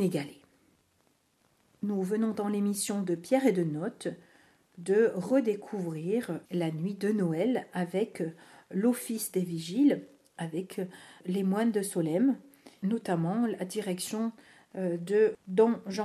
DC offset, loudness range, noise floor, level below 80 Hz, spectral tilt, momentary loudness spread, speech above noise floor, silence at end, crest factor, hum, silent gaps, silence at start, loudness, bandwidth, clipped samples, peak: under 0.1%; 2 LU; -70 dBFS; -80 dBFS; -6 dB/octave; 12 LU; 41 dB; 0 s; 18 dB; none; none; 0 s; -30 LUFS; 14 kHz; under 0.1%; -12 dBFS